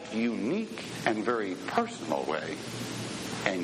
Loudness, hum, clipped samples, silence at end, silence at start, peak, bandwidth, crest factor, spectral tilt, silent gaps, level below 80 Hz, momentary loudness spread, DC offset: -32 LUFS; none; under 0.1%; 0 s; 0 s; -8 dBFS; 14 kHz; 24 dB; -4.5 dB/octave; none; -66 dBFS; 6 LU; under 0.1%